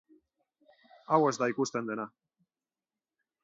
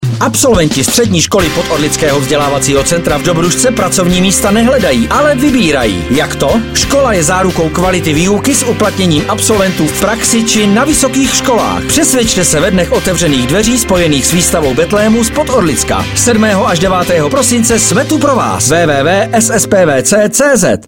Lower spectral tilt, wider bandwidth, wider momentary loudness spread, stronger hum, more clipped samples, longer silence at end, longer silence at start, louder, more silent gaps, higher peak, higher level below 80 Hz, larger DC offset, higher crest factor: first, -5 dB/octave vs -3.5 dB/octave; second, 8 kHz vs 17.5 kHz; first, 12 LU vs 3 LU; neither; neither; first, 1.35 s vs 0 s; first, 1.1 s vs 0 s; second, -30 LUFS vs -9 LUFS; neither; second, -10 dBFS vs 0 dBFS; second, -84 dBFS vs -28 dBFS; second, under 0.1% vs 0.7%; first, 24 dB vs 10 dB